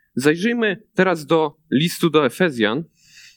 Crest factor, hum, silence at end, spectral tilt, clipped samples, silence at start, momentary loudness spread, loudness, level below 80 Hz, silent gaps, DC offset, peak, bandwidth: 18 dB; none; 0.5 s; -5.5 dB/octave; under 0.1%; 0.15 s; 4 LU; -19 LUFS; -66 dBFS; none; under 0.1%; -2 dBFS; 19 kHz